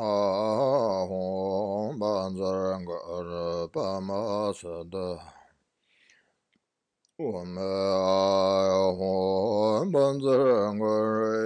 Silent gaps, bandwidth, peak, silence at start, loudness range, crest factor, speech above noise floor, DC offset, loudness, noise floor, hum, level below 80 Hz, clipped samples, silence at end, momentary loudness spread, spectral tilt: none; 10 kHz; -12 dBFS; 0 s; 11 LU; 16 dB; 52 dB; under 0.1%; -27 LUFS; -78 dBFS; none; -66 dBFS; under 0.1%; 0 s; 11 LU; -6.5 dB/octave